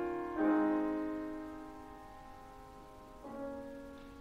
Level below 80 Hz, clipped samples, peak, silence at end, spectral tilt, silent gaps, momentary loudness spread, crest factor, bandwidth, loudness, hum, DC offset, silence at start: -60 dBFS; under 0.1%; -22 dBFS; 0 s; -7 dB/octave; none; 22 LU; 18 dB; 8.8 kHz; -37 LUFS; none; under 0.1%; 0 s